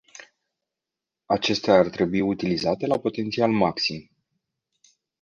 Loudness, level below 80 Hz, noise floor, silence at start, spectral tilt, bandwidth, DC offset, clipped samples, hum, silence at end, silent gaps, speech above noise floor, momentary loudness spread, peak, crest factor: -23 LUFS; -58 dBFS; -87 dBFS; 0.15 s; -5.5 dB/octave; 9.8 kHz; under 0.1%; under 0.1%; none; 1.2 s; none; 65 dB; 8 LU; -4 dBFS; 22 dB